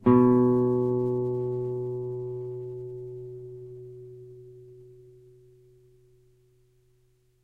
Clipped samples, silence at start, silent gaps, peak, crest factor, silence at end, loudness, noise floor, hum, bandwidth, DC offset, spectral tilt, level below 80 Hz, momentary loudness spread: under 0.1%; 0 s; none; -8 dBFS; 22 dB; 2.6 s; -26 LUFS; -65 dBFS; none; 3.4 kHz; under 0.1%; -11.5 dB/octave; -62 dBFS; 26 LU